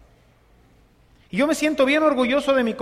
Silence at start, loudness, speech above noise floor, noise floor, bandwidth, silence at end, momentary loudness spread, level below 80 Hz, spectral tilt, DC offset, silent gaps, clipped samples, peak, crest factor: 1.35 s; -20 LUFS; 36 dB; -55 dBFS; 15 kHz; 0 s; 5 LU; -54 dBFS; -4 dB/octave; under 0.1%; none; under 0.1%; -6 dBFS; 16 dB